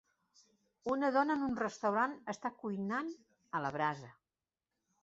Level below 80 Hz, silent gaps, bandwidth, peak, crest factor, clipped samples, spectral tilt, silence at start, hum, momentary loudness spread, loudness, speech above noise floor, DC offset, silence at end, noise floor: -76 dBFS; none; 8 kHz; -18 dBFS; 20 dB; under 0.1%; -4.5 dB/octave; 0.85 s; none; 12 LU; -36 LUFS; over 54 dB; under 0.1%; 0.9 s; under -90 dBFS